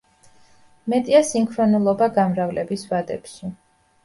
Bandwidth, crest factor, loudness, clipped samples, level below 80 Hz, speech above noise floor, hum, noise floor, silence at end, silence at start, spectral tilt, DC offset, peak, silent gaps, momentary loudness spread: 11.5 kHz; 20 dB; -20 LUFS; under 0.1%; -60 dBFS; 33 dB; none; -52 dBFS; 0.5 s; 0.85 s; -6 dB/octave; under 0.1%; -2 dBFS; none; 17 LU